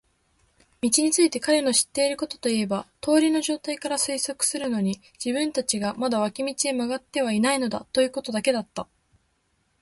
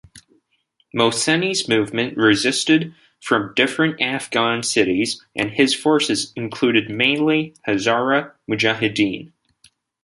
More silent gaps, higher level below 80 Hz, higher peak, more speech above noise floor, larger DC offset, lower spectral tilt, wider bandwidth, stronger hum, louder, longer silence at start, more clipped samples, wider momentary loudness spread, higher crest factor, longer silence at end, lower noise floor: neither; about the same, -64 dBFS vs -60 dBFS; second, -6 dBFS vs -2 dBFS; about the same, 46 dB vs 47 dB; neither; about the same, -3 dB/octave vs -3.5 dB/octave; about the same, 12 kHz vs 11.5 kHz; neither; second, -24 LUFS vs -19 LUFS; first, 0.85 s vs 0.15 s; neither; about the same, 8 LU vs 7 LU; about the same, 18 dB vs 18 dB; first, 1 s vs 0.75 s; first, -70 dBFS vs -66 dBFS